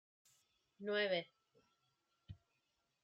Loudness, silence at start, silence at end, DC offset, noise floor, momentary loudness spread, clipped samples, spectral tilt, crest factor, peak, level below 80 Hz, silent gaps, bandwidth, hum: -40 LUFS; 0.8 s; 0.7 s; under 0.1%; -85 dBFS; 23 LU; under 0.1%; -5 dB/octave; 22 dB; -26 dBFS; -78 dBFS; none; 8.6 kHz; none